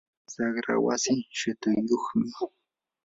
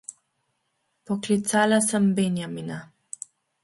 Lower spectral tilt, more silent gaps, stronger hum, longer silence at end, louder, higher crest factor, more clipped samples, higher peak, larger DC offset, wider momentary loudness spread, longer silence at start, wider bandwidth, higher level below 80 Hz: about the same, -4 dB/octave vs -4.5 dB/octave; neither; neither; second, 0.6 s vs 0.8 s; second, -28 LUFS vs -23 LUFS; about the same, 16 dB vs 18 dB; neither; second, -12 dBFS vs -8 dBFS; neither; second, 10 LU vs 19 LU; first, 0.3 s vs 0.1 s; second, 7.8 kHz vs 12 kHz; about the same, -68 dBFS vs -68 dBFS